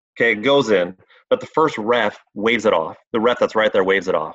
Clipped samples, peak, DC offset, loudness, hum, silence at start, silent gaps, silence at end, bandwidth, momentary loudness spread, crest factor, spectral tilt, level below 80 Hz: under 0.1%; -4 dBFS; under 0.1%; -18 LUFS; none; 0.15 s; 3.07-3.11 s; 0 s; 8 kHz; 7 LU; 14 dB; -5 dB/octave; -58 dBFS